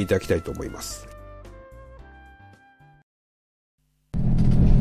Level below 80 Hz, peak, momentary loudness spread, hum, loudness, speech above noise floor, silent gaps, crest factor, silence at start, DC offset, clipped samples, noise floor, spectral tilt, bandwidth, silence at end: -30 dBFS; -6 dBFS; 26 LU; none; -25 LUFS; 27 dB; 3.03-3.78 s; 18 dB; 0 s; under 0.1%; under 0.1%; -54 dBFS; -7 dB/octave; 14.5 kHz; 0 s